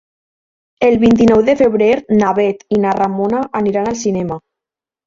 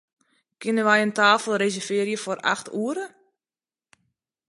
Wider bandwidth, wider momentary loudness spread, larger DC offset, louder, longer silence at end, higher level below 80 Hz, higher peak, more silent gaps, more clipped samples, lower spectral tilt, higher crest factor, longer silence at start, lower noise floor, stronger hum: second, 7.6 kHz vs 11.5 kHz; second, 8 LU vs 12 LU; neither; first, -14 LUFS vs -23 LUFS; second, 0.7 s vs 1.4 s; first, -44 dBFS vs -78 dBFS; first, 0 dBFS vs -4 dBFS; neither; neither; first, -6.5 dB/octave vs -3.5 dB/octave; second, 14 dB vs 22 dB; first, 0.8 s vs 0.6 s; second, -86 dBFS vs under -90 dBFS; neither